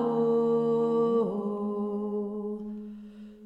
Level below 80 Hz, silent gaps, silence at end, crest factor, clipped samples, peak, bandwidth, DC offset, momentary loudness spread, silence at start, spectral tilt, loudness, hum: -68 dBFS; none; 0 s; 12 dB; under 0.1%; -16 dBFS; 5 kHz; under 0.1%; 16 LU; 0 s; -9.5 dB/octave; -28 LUFS; none